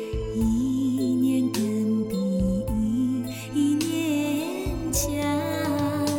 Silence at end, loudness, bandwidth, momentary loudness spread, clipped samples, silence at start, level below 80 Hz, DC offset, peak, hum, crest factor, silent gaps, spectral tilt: 0 s; -25 LUFS; 17.5 kHz; 4 LU; under 0.1%; 0 s; -38 dBFS; 0.1%; -12 dBFS; none; 12 dB; none; -5.5 dB/octave